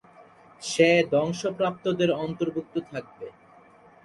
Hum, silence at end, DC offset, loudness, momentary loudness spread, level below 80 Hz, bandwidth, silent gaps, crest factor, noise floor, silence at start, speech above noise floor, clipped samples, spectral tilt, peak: none; 0.75 s; under 0.1%; -25 LUFS; 19 LU; -64 dBFS; 11.5 kHz; none; 20 dB; -54 dBFS; 0.2 s; 28 dB; under 0.1%; -5 dB/octave; -6 dBFS